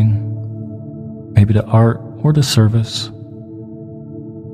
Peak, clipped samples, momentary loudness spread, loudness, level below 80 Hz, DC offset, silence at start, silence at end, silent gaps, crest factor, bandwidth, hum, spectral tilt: 0 dBFS; under 0.1%; 19 LU; -15 LUFS; -44 dBFS; under 0.1%; 0 s; 0 s; none; 16 dB; 14.5 kHz; none; -6.5 dB/octave